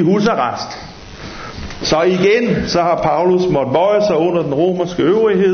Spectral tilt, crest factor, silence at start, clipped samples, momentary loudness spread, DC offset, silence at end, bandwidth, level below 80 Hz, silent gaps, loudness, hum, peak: -6 dB/octave; 12 dB; 0 s; under 0.1%; 16 LU; under 0.1%; 0 s; 6.6 kHz; -40 dBFS; none; -14 LUFS; none; -2 dBFS